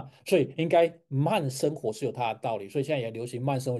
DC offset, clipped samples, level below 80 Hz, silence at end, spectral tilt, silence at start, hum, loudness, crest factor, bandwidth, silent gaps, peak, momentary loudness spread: under 0.1%; under 0.1%; -74 dBFS; 0 s; -6 dB/octave; 0 s; none; -28 LUFS; 16 dB; 12.5 kHz; none; -12 dBFS; 8 LU